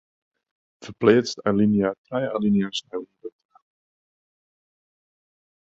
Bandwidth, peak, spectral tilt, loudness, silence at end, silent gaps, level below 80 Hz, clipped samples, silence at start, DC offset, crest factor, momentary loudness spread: 7.8 kHz; -2 dBFS; -6 dB/octave; -22 LUFS; 2.3 s; 1.98-2.04 s; -60 dBFS; under 0.1%; 0.8 s; under 0.1%; 22 dB; 22 LU